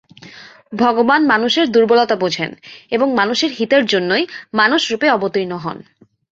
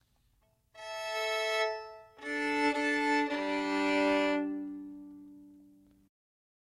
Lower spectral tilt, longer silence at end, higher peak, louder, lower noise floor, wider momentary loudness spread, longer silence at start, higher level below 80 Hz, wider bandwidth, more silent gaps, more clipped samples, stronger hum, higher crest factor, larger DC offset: about the same, -4 dB/octave vs -3 dB/octave; second, 0.5 s vs 1.2 s; first, -2 dBFS vs -18 dBFS; first, -15 LUFS vs -31 LUFS; second, -40 dBFS vs -71 dBFS; second, 11 LU vs 19 LU; second, 0.2 s vs 0.75 s; first, -62 dBFS vs -70 dBFS; second, 7.8 kHz vs 13 kHz; neither; neither; neither; about the same, 16 dB vs 16 dB; neither